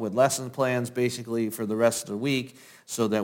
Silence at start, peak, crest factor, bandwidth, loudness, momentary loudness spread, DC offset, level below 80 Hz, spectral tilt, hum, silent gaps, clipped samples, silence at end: 0 s; -8 dBFS; 18 dB; 17 kHz; -27 LUFS; 6 LU; under 0.1%; -72 dBFS; -4.5 dB/octave; none; none; under 0.1%; 0 s